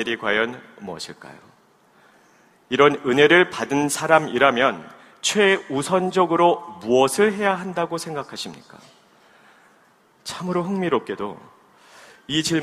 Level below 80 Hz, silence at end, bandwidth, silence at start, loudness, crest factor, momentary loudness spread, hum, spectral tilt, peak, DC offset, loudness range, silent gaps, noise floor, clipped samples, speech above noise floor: -64 dBFS; 0 s; 15 kHz; 0 s; -20 LUFS; 22 dB; 17 LU; none; -4 dB/octave; 0 dBFS; under 0.1%; 11 LU; none; -57 dBFS; under 0.1%; 37 dB